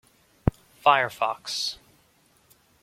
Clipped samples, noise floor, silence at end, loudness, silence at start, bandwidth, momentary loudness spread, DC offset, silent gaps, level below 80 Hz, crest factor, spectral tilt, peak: under 0.1%; -62 dBFS; 1.05 s; -25 LUFS; 0.45 s; 16.5 kHz; 9 LU; under 0.1%; none; -44 dBFS; 26 dB; -4 dB/octave; -2 dBFS